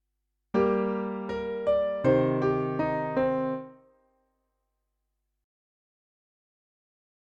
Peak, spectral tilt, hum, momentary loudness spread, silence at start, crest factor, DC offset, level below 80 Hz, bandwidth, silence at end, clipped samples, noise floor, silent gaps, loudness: -10 dBFS; -9 dB/octave; none; 9 LU; 0.55 s; 20 dB; under 0.1%; -58 dBFS; 7.4 kHz; 3.6 s; under 0.1%; -81 dBFS; none; -27 LUFS